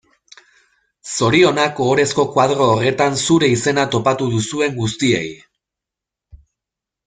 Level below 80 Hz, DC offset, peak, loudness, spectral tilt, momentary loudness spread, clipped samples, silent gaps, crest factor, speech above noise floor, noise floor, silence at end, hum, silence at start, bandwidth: -52 dBFS; under 0.1%; -2 dBFS; -16 LUFS; -4.5 dB/octave; 7 LU; under 0.1%; none; 16 dB; 69 dB; -85 dBFS; 0.7 s; none; 1.05 s; 9.6 kHz